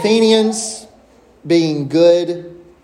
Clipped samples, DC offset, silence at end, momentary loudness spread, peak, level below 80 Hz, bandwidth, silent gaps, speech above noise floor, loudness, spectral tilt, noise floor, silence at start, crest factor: under 0.1%; under 0.1%; 0.25 s; 14 LU; 0 dBFS; -58 dBFS; 13 kHz; none; 34 dB; -14 LUFS; -4.5 dB/octave; -48 dBFS; 0 s; 14 dB